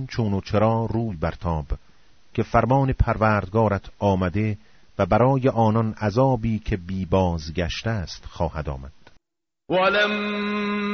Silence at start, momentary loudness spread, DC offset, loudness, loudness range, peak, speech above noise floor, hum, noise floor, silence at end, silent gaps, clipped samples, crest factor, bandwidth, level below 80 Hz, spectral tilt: 0 s; 10 LU; 0.3%; -23 LUFS; 4 LU; -4 dBFS; 65 dB; none; -87 dBFS; 0 s; none; under 0.1%; 18 dB; 6.6 kHz; -36 dBFS; -5.5 dB/octave